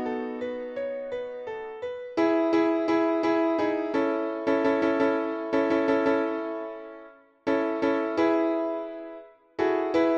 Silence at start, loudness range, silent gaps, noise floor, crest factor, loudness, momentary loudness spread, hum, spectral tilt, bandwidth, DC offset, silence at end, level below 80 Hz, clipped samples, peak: 0 s; 3 LU; none; -50 dBFS; 14 dB; -26 LUFS; 12 LU; none; -6 dB/octave; 7.2 kHz; under 0.1%; 0 s; -66 dBFS; under 0.1%; -12 dBFS